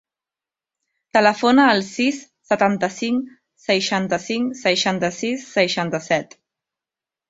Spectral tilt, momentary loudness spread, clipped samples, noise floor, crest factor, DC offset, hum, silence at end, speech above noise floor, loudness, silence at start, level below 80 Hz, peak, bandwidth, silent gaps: -4 dB/octave; 9 LU; under 0.1%; -89 dBFS; 20 dB; under 0.1%; none; 1.05 s; 70 dB; -19 LUFS; 1.15 s; -64 dBFS; -2 dBFS; 8 kHz; none